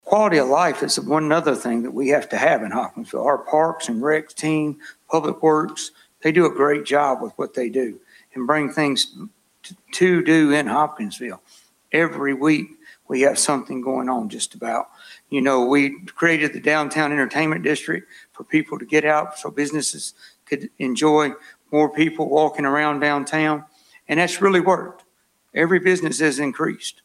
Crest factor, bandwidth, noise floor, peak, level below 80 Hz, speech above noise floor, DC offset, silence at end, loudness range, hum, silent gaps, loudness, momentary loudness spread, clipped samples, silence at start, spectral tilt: 20 dB; 15 kHz; -64 dBFS; 0 dBFS; -68 dBFS; 44 dB; under 0.1%; 0.15 s; 2 LU; none; none; -20 LUFS; 11 LU; under 0.1%; 0.05 s; -4 dB/octave